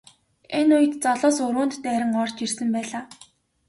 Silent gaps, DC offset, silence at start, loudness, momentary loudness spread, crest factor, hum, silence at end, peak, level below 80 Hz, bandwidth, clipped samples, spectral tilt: none; under 0.1%; 0.5 s; -23 LUFS; 11 LU; 16 dB; none; 0.55 s; -8 dBFS; -68 dBFS; 11.5 kHz; under 0.1%; -3.5 dB/octave